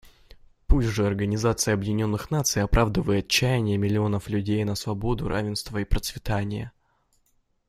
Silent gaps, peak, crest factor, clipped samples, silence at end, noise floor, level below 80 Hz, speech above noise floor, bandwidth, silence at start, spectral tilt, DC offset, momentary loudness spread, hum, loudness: none; -4 dBFS; 20 dB; under 0.1%; 1 s; -68 dBFS; -32 dBFS; 43 dB; 15.5 kHz; 0.7 s; -5 dB/octave; under 0.1%; 7 LU; none; -25 LUFS